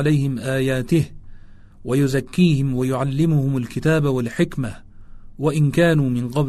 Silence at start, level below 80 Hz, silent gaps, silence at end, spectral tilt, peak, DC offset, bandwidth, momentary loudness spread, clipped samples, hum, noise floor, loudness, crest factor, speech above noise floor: 0 s; -42 dBFS; none; 0 s; -7 dB/octave; -4 dBFS; under 0.1%; 13.5 kHz; 7 LU; under 0.1%; none; -40 dBFS; -20 LUFS; 16 dB; 22 dB